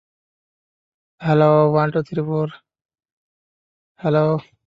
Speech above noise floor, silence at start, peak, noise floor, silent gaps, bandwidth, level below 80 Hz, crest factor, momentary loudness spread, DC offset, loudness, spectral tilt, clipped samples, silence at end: over 73 dB; 1.2 s; -2 dBFS; under -90 dBFS; 2.85-2.89 s, 3.12-3.95 s; 5.6 kHz; -62 dBFS; 18 dB; 12 LU; under 0.1%; -19 LUFS; -9.5 dB/octave; under 0.1%; 0.25 s